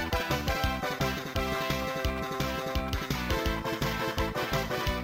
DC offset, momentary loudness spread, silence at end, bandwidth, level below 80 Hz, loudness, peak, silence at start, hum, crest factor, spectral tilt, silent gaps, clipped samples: under 0.1%; 2 LU; 0 s; 16 kHz; -38 dBFS; -31 LUFS; -14 dBFS; 0 s; none; 16 dB; -4.5 dB/octave; none; under 0.1%